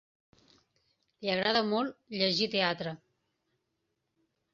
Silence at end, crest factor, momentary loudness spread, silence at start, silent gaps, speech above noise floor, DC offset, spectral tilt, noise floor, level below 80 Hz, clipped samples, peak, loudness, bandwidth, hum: 1.55 s; 22 dB; 11 LU; 1.2 s; none; 51 dB; under 0.1%; -2 dB/octave; -82 dBFS; -74 dBFS; under 0.1%; -12 dBFS; -30 LUFS; 7.4 kHz; none